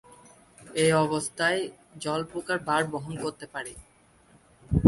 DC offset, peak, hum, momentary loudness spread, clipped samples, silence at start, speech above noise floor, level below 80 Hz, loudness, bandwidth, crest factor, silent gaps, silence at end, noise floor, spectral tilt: under 0.1%; -2 dBFS; none; 14 LU; under 0.1%; 0.6 s; 31 dB; -46 dBFS; -28 LUFS; 11.5 kHz; 26 dB; none; 0 s; -59 dBFS; -5 dB/octave